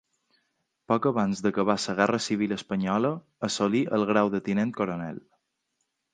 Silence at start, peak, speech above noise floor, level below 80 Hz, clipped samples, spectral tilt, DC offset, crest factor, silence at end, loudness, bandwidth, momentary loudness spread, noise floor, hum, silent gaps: 0.9 s; -6 dBFS; 52 dB; -64 dBFS; under 0.1%; -5.5 dB/octave; under 0.1%; 22 dB; 0.95 s; -26 LUFS; 9.6 kHz; 7 LU; -78 dBFS; none; none